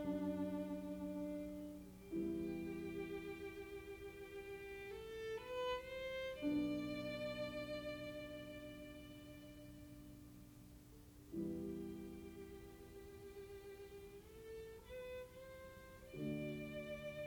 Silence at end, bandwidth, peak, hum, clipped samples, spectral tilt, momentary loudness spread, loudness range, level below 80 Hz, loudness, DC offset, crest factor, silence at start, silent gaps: 0 s; over 20 kHz; -30 dBFS; none; under 0.1%; -6 dB/octave; 14 LU; 10 LU; -66 dBFS; -48 LUFS; under 0.1%; 18 dB; 0 s; none